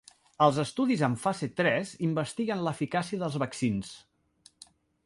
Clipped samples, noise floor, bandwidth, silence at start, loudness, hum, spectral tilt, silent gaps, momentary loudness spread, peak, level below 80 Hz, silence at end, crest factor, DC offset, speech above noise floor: under 0.1%; -62 dBFS; 11.5 kHz; 0.4 s; -29 LUFS; none; -6 dB/octave; none; 6 LU; -8 dBFS; -64 dBFS; 1.1 s; 22 dB; under 0.1%; 34 dB